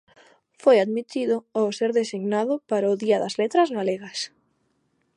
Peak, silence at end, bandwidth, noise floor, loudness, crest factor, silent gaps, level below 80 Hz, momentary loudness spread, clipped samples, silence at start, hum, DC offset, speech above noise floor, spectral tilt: -6 dBFS; 0.9 s; 11 kHz; -70 dBFS; -23 LUFS; 18 dB; none; -78 dBFS; 9 LU; under 0.1%; 0.65 s; none; under 0.1%; 47 dB; -5 dB/octave